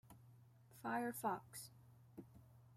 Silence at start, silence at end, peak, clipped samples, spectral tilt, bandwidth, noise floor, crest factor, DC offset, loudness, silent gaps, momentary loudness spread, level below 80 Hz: 0.05 s; 0 s; -28 dBFS; under 0.1%; -4.5 dB/octave; 16 kHz; -66 dBFS; 20 dB; under 0.1%; -46 LUFS; none; 23 LU; -82 dBFS